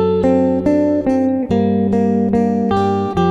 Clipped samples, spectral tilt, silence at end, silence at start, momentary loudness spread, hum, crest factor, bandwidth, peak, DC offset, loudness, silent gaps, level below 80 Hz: under 0.1%; -9 dB/octave; 0 s; 0 s; 2 LU; none; 12 dB; 8 kHz; -2 dBFS; under 0.1%; -15 LUFS; none; -42 dBFS